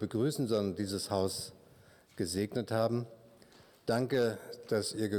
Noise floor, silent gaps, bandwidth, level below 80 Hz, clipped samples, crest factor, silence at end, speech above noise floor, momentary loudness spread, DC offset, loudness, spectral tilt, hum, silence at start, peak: -61 dBFS; none; 19.5 kHz; -68 dBFS; under 0.1%; 18 dB; 0 s; 28 dB; 11 LU; under 0.1%; -34 LUFS; -5.5 dB/octave; none; 0 s; -18 dBFS